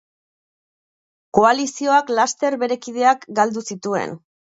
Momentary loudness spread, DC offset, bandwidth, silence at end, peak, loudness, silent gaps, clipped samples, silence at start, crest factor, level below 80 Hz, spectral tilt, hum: 9 LU; under 0.1%; 8.2 kHz; 0.35 s; 0 dBFS; -19 LUFS; none; under 0.1%; 1.35 s; 20 dB; -60 dBFS; -3.5 dB/octave; none